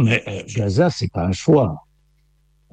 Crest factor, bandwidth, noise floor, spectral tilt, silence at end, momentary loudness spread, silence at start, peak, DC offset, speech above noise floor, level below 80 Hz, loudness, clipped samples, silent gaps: 16 dB; 9 kHz; -59 dBFS; -6.5 dB/octave; 0.95 s; 8 LU; 0 s; -4 dBFS; under 0.1%; 41 dB; -46 dBFS; -19 LUFS; under 0.1%; none